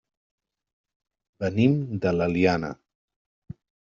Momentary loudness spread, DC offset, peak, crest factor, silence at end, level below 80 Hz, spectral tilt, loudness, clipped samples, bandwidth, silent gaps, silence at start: 11 LU; under 0.1%; -8 dBFS; 20 dB; 1.2 s; -58 dBFS; -6.5 dB/octave; -24 LUFS; under 0.1%; 7.4 kHz; none; 1.4 s